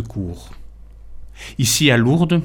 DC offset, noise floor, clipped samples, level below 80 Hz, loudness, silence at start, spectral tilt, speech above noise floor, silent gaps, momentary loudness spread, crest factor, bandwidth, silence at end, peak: under 0.1%; -37 dBFS; under 0.1%; -38 dBFS; -16 LUFS; 0 s; -4.5 dB/octave; 19 dB; none; 22 LU; 20 dB; 17.5 kHz; 0 s; 0 dBFS